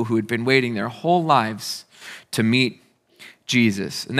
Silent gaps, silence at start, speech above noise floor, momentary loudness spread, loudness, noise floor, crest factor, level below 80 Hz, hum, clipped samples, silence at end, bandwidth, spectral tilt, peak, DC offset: none; 0 s; 27 dB; 14 LU; -21 LUFS; -48 dBFS; 20 dB; -72 dBFS; none; under 0.1%; 0 s; 15.5 kHz; -5 dB/octave; 0 dBFS; under 0.1%